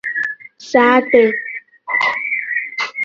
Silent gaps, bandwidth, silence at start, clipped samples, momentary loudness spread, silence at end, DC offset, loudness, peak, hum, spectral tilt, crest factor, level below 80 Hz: none; 7.4 kHz; 0.05 s; under 0.1%; 14 LU; 0 s; under 0.1%; -16 LUFS; 0 dBFS; none; -4 dB/octave; 16 dB; -62 dBFS